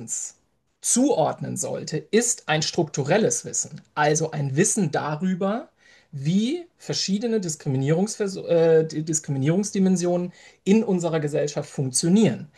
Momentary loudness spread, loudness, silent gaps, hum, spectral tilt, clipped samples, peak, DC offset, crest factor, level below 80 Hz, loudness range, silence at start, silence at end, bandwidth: 9 LU; -23 LUFS; none; none; -4.5 dB/octave; under 0.1%; -6 dBFS; under 0.1%; 16 dB; -68 dBFS; 3 LU; 0 s; 0.1 s; 12.5 kHz